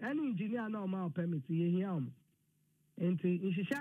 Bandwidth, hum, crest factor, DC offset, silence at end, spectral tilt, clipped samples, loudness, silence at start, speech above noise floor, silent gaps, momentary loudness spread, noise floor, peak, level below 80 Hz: 4.6 kHz; none; 14 dB; under 0.1%; 0 s; -8.5 dB/octave; under 0.1%; -37 LUFS; 0 s; 40 dB; none; 5 LU; -76 dBFS; -22 dBFS; -86 dBFS